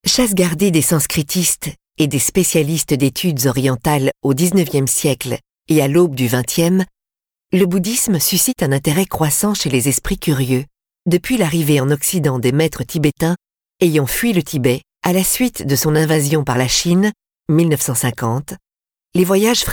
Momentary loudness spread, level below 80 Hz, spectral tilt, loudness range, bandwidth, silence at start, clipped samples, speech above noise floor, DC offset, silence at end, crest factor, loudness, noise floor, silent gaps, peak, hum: 6 LU; -42 dBFS; -4.5 dB/octave; 1 LU; 20 kHz; 0.05 s; under 0.1%; 74 dB; under 0.1%; 0 s; 14 dB; -16 LUFS; -89 dBFS; none; -2 dBFS; none